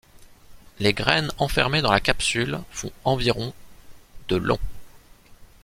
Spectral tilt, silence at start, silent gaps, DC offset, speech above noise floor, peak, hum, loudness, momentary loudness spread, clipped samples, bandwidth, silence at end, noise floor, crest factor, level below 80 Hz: -4 dB/octave; 0.2 s; none; under 0.1%; 26 dB; 0 dBFS; none; -23 LUFS; 12 LU; under 0.1%; 16.5 kHz; 0.2 s; -49 dBFS; 24 dB; -40 dBFS